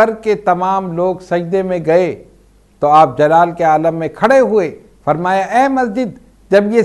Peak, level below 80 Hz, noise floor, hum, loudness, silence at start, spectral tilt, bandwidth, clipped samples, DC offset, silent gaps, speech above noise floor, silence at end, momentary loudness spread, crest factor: 0 dBFS; -50 dBFS; -48 dBFS; none; -14 LUFS; 0 s; -6.5 dB/octave; 12 kHz; 0.1%; under 0.1%; none; 35 dB; 0 s; 9 LU; 14 dB